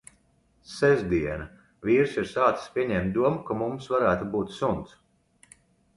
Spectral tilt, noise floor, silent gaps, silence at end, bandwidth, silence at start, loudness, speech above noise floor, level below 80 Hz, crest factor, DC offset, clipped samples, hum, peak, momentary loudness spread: -7 dB/octave; -65 dBFS; none; 1.1 s; 11.5 kHz; 0.7 s; -26 LUFS; 40 dB; -50 dBFS; 20 dB; under 0.1%; under 0.1%; none; -8 dBFS; 12 LU